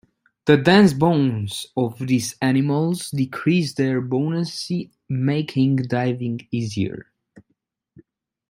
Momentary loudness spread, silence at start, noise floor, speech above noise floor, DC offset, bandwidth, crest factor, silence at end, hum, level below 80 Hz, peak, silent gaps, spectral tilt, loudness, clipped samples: 12 LU; 0.45 s; -72 dBFS; 52 dB; under 0.1%; 16 kHz; 20 dB; 1.1 s; none; -58 dBFS; -2 dBFS; none; -6 dB/octave; -21 LUFS; under 0.1%